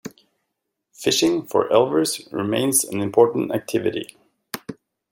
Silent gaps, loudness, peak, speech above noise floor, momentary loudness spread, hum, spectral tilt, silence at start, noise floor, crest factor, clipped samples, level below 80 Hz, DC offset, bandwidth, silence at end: none; -20 LUFS; -2 dBFS; 58 dB; 16 LU; none; -3.5 dB/octave; 0.05 s; -79 dBFS; 20 dB; under 0.1%; -64 dBFS; under 0.1%; 16.5 kHz; 0.4 s